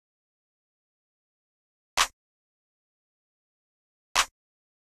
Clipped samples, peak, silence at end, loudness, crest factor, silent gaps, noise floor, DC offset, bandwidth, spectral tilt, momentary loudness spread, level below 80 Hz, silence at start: under 0.1%; -8 dBFS; 0.6 s; -27 LUFS; 30 dB; 2.13-4.15 s; under -90 dBFS; under 0.1%; 14.5 kHz; 2 dB/octave; 5 LU; -58 dBFS; 1.95 s